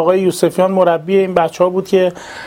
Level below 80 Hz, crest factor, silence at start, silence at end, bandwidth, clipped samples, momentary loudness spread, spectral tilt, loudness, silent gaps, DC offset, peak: -54 dBFS; 14 dB; 0 s; 0 s; 16.5 kHz; under 0.1%; 3 LU; -6 dB/octave; -14 LUFS; none; under 0.1%; 0 dBFS